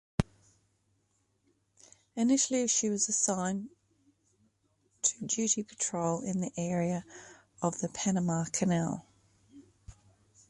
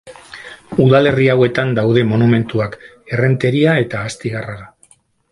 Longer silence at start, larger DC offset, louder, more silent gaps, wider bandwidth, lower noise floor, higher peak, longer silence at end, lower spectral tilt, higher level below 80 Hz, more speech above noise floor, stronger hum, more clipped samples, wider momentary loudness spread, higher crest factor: first, 0.2 s vs 0.05 s; neither; second, -31 LUFS vs -15 LUFS; neither; about the same, 11.5 kHz vs 11.5 kHz; first, -75 dBFS vs -52 dBFS; second, -8 dBFS vs 0 dBFS; about the same, 0.6 s vs 0.65 s; second, -4 dB/octave vs -7.5 dB/octave; second, -58 dBFS vs -48 dBFS; first, 44 dB vs 38 dB; neither; neither; second, 12 LU vs 22 LU; first, 26 dB vs 16 dB